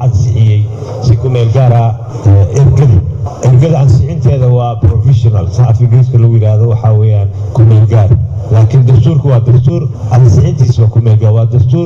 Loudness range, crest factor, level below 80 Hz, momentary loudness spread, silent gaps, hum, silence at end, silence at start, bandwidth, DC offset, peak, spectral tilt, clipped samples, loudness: 1 LU; 6 dB; -28 dBFS; 5 LU; none; none; 0 s; 0 s; 7.4 kHz; under 0.1%; 0 dBFS; -9 dB/octave; 0.4%; -8 LUFS